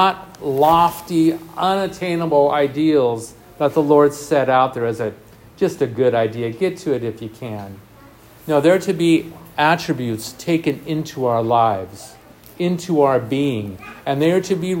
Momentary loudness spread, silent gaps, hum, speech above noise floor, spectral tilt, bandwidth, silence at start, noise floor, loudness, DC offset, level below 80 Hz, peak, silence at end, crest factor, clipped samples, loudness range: 13 LU; none; none; 27 dB; -6 dB/octave; 16.5 kHz; 0 s; -45 dBFS; -18 LUFS; under 0.1%; -54 dBFS; 0 dBFS; 0 s; 18 dB; under 0.1%; 4 LU